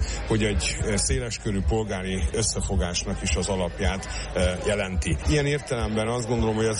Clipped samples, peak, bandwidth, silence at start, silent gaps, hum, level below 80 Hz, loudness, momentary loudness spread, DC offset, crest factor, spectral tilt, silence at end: under 0.1%; -12 dBFS; 11.5 kHz; 0 s; none; none; -32 dBFS; -26 LUFS; 4 LU; under 0.1%; 14 dB; -4.5 dB/octave; 0 s